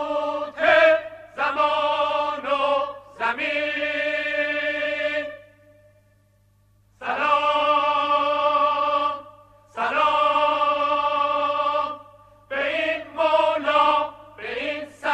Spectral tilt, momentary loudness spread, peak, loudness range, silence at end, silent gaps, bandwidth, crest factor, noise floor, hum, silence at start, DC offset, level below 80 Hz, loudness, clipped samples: -3.5 dB/octave; 10 LU; -4 dBFS; 4 LU; 0 s; none; 9 kHz; 18 dB; -60 dBFS; none; 0 s; under 0.1%; -62 dBFS; -22 LUFS; under 0.1%